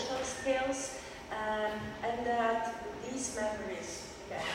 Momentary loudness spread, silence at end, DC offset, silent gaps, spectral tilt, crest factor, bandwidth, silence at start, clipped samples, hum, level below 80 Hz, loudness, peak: 10 LU; 0 s; under 0.1%; none; -3 dB/octave; 16 dB; 16 kHz; 0 s; under 0.1%; none; -58 dBFS; -36 LUFS; -18 dBFS